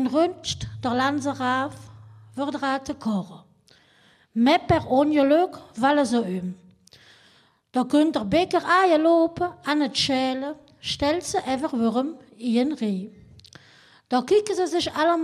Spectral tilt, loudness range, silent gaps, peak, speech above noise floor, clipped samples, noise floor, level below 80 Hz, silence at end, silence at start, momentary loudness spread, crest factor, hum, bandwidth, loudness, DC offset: -5 dB/octave; 5 LU; none; -6 dBFS; 36 dB; under 0.1%; -59 dBFS; -54 dBFS; 0 s; 0 s; 12 LU; 18 dB; none; 14 kHz; -23 LUFS; under 0.1%